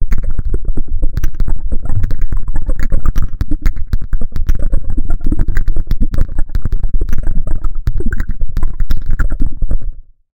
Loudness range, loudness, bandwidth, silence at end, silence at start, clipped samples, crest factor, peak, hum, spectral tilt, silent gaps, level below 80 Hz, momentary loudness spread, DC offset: 1 LU; -22 LUFS; 2.2 kHz; 0 s; 0 s; 1%; 8 dB; 0 dBFS; none; -7.5 dB/octave; none; -12 dBFS; 3 LU; 5%